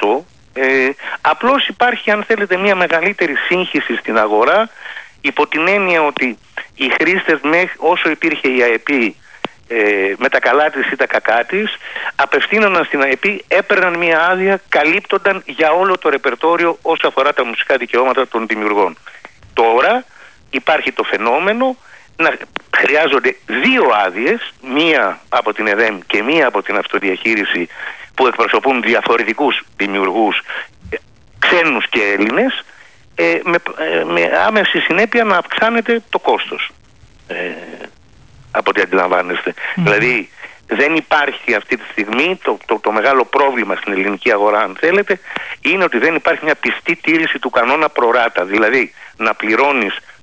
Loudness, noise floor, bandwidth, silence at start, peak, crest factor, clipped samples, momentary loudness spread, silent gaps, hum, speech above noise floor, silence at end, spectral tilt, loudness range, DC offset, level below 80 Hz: -14 LUFS; -45 dBFS; 8 kHz; 0 s; -2 dBFS; 12 dB; under 0.1%; 8 LU; none; none; 31 dB; 0.25 s; -5 dB/octave; 2 LU; 0.4%; -56 dBFS